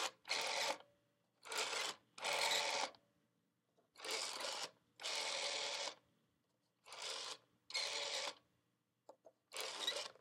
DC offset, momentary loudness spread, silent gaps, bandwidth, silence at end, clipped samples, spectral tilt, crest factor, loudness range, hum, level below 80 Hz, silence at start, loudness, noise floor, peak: under 0.1%; 12 LU; none; 16.5 kHz; 0.1 s; under 0.1%; 1.5 dB/octave; 20 dB; 5 LU; none; under -90 dBFS; 0 s; -42 LUFS; -85 dBFS; -26 dBFS